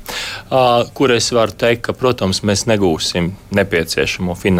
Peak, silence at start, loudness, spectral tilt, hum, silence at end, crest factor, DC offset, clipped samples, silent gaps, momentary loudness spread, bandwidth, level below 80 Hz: -2 dBFS; 0 s; -16 LUFS; -4.5 dB/octave; none; 0 s; 14 dB; under 0.1%; under 0.1%; none; 5 LU; 16.5 kHz; -40 dBFS